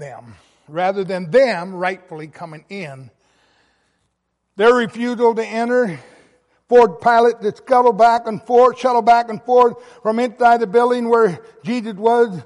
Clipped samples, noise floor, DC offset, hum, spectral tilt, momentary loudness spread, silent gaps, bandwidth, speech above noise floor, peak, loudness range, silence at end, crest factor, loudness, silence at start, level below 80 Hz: under 0.1%; -72 dBFS; under 0.1%; none; -6 dB/octave; 18 LU; none; 11 kHz; 55 dB; -2 dBFS; 8 LU; 0.05 s; 14 dB; -16 LUFS; 0 s; -60 dBFS